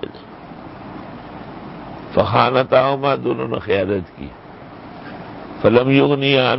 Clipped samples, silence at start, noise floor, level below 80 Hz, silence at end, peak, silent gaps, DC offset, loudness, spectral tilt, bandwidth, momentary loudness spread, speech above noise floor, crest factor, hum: under 0.1%; 0 s; -37 dBFS; -46 dBFS; 0 s; 0 dBFS; none; under 0.1%; -17 LUFS; -11 dB/octave; 5.8 kHz; 22 LU; 21 dB; 18 dB; none